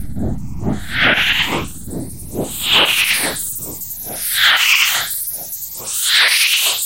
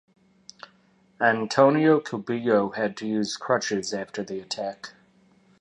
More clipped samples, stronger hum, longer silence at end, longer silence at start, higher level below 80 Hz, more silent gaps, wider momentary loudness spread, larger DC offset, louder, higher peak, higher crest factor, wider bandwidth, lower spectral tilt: neither; neither; second, 0 s vs 0.7 s; second, 0 s vs 1.2 s; first, -38 dBFS vs -70 dBFS; neither; about the same, 14 LU vs 14 LU; neither; first, -14 LUFS vs -24 LUFS; first, 0 dBFS vs -4 dBFS; second, 16 dB vs 22 dB; first, 17.5 kHz vs 11 kHz; second, -1 dB/octave vs -5 dB/octave